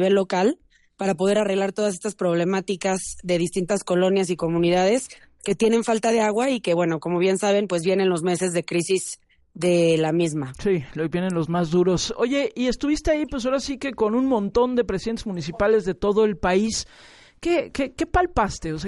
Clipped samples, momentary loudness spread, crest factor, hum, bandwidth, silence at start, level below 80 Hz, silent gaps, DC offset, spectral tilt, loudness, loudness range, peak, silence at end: under 0.1%; 7 LU; 14 dB; none; 11.5 kHz; 0 s; -44 dBFS; none; under 0.1%; -5 dB/octave; -22 LUFS; 2 LU; -8 dBFS; 0 s